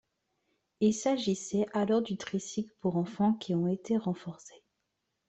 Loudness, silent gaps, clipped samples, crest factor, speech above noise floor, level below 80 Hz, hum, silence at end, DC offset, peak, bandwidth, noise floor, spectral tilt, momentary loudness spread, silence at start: -31 LUFS; none; under 0.1%; 16 dB; 52 dB; -70 dBFS; none; 0.75 s; under 0.1%; -16 dBFS; 8.4 kHz; -82 dBFS; -6 dB/octave; 8 LU; 0.8 s